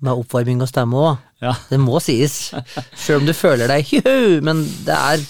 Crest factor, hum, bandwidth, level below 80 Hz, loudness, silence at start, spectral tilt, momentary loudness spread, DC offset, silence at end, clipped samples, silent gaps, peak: 14 dB; none; over 20 kHz; -52 dBFS; -17 LUFS; 0 s; -5.5 dB/octave; 10 LU; 0.9%; 0 s; under 0.1%; none; -2 dBFS